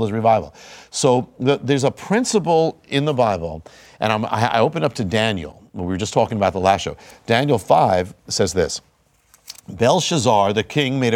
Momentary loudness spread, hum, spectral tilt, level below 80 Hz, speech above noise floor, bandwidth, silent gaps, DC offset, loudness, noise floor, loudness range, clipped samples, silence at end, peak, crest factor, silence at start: 13 LU; none; -5 dB/octave; -50 dBFS; 38 dB; 16.5 kHz; none; under 0.1%; -19 LUFS; -56 dBFS; 2 LU; under 0.1%; 0 s; 0 dBFS; 18 dB; 0 s